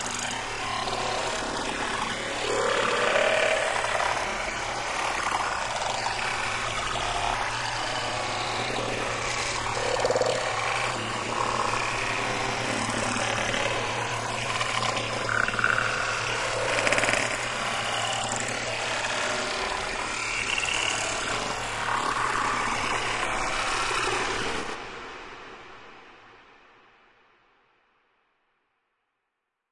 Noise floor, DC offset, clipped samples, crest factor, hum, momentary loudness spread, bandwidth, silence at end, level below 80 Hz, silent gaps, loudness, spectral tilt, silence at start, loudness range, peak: -81 dBFS; under 0.1%; under 0.1%; 22 dB; none; 5 LU; 11.5 kHz; 3.3 s; -48 dBFS; none; -26 LUFS; -2 dB/octave; 0 s; 3 LU; -6 dBFS